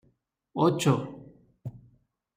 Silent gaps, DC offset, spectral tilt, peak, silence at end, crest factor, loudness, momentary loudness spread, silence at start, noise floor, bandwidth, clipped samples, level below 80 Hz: none; under 0.1%; -6.5 dB/octave; -10 dBFS; 0.6 s; 20 dB; -26 LUFS; 20 LU; 0.55 s; -71 dBFS; 16 kHz; under 0.1%; -66 dBFS